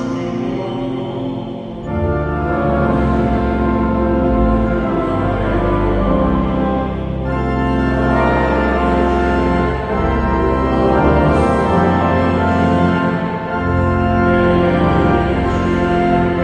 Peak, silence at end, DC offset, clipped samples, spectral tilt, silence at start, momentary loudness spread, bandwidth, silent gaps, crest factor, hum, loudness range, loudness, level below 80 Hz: 0 dBFS; 0 s; under 0.1%; under 0.1%; -8.5 dB/octave; 0 s; 7 LU; 9.4 kHz; none; 14 dB; none; 3 LU; -16 LUFS; -24 dBFS